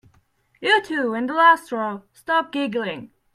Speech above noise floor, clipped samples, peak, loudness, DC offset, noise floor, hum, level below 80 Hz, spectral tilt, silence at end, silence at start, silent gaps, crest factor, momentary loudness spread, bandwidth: 41 dB; under 0.1%; -2 dBFS; -21 LUFS; under 0.1%; -62 dBFS; none; -68 dBFS; -4 dB/octave; 0.3 s; 0.6 s; none; 20 dB; 14 LU; 14 kHz